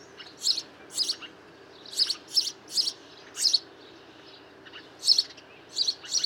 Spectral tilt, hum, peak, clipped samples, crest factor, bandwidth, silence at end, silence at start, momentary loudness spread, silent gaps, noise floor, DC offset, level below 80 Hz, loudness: 1.5 dB/octave; none; -6 dBFS; under 0.1%; 24 dB; 17.5 kHz; 0 s; 0 s; 23 LU; none; -50 dBFS; under 0.1%; -78 dBFS; -26 LUFS